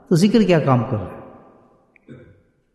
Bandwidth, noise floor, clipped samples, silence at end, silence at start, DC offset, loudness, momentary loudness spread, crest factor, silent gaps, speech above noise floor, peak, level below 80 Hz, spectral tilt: 12.5 kHz; -55 dBFS; under 0.1%; 0.6 s; 0.1 s; under 0.1%; -17 LUFS; 19 LU; 16 dB; none; 39 dB; -4 dBFS; -50 dBFS; -7 dB/octave